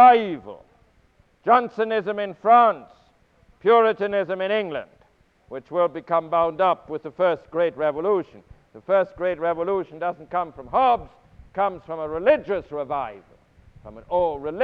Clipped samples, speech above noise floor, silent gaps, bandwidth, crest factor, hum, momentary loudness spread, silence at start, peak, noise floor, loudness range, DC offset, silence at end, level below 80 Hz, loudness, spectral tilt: under 0.1%; 38 dB; none; 5 kHz; 18 dB; none; 14 LU; 0 s; -4 dBFS; -60 dBFS; 4 LU; under 0.1%; 0 s; -56 dBFS; -22 LUFS; -7.5 dB/octave